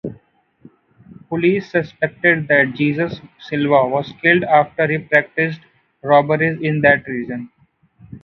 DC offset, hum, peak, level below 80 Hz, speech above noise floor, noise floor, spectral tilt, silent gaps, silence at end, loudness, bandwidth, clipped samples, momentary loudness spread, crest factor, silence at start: under 0.1%; none; 0 dBFS; -56 dBFS; 38 dB; -55 dBFS; -8.5 dB/octave; none; 0.05 s; -17 LUFS; 6.4 kHz; under 0.1%; 13 LU; 18 dB; 0.05 s